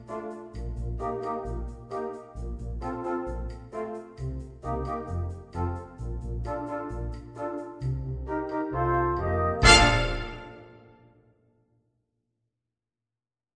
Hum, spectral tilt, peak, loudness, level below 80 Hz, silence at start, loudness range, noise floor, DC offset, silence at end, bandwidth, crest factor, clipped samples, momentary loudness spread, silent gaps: none; -4 dB/octave; -2 dBFS; -28 LUFS; -36 dBFS; 0 s; 11 LU; under -90 dBFS; under 0.1%; 2.65 s; 10 kHz; 28 dB; under 0.1%; 14 LU; none